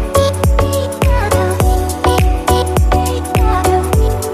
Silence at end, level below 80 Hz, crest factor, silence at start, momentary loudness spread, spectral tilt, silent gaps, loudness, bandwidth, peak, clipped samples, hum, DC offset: 0 s; -16 dBFS; 12 dB; 0 s; 2 LU; -5.5 dB/octave; none; -14 LUFS; 14 kHz; 0 dBFS; under 0.1%; none; under 0.1%